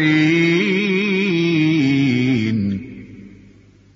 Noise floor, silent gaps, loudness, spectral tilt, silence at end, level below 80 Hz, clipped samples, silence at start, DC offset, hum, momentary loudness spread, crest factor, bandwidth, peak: -47 dBFS; none; -17 LUFS; -6.5 dB/octave; 0.65 s; -54 dBFS; under 0.1%; 0 s; under 0.1%; none; 10 LU; 14 dB; 7.6 kHz; -4 dBFS